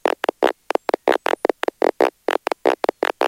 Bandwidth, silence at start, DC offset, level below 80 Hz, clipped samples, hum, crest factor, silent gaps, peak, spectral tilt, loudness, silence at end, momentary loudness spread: 17 kHz; 0.05 s; under 0.1%; -62 dBFS; under 0.1%; none; 18 dB; none; -2 dBFS; -3 dB/octave; -21 LUFS; 0 s; 3 LU